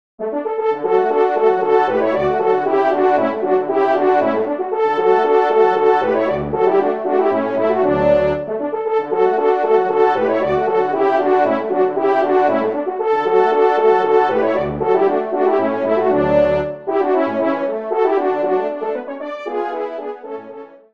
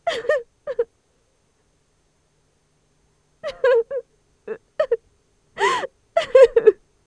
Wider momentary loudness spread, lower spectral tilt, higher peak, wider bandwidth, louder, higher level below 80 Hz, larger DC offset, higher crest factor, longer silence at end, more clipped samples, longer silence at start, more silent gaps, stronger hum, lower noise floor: second, 8 LU vs 20 LU; first, -7.5 dB/octave vs -3 dB/octave; about the same, -2 dBFS vs 0 dBFS; second, 6.2 kHz vs 10.5 kHz; first, -16 LUFS vs -20 LUFS; first, -48 dBFS vs -58 dBFS; first, 0.4% vs under 0.1%; second, 14 dB vs 22 dB; second, 0.15 s vs 0.35 s; neither; first, 0.2 s vs 0.05 s; neither; neither; second, -36 dBFS vs -65 dBFS